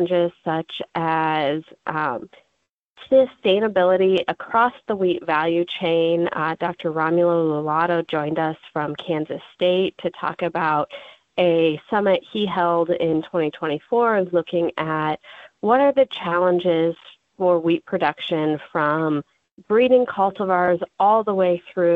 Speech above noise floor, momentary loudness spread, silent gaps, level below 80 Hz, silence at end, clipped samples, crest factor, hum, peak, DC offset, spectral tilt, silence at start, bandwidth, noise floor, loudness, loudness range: 53 dB; 9 LU; 2.69-2.96 s, 19.52-19.57 s; -64 dBFS; 0 s; under 0.1%; 16 dB; none; -4 dBFS; under 0.1%; -8 dB/octave; 0 s; 4.9 kHz; -73 dBFS; -21 LUFS; 3 LU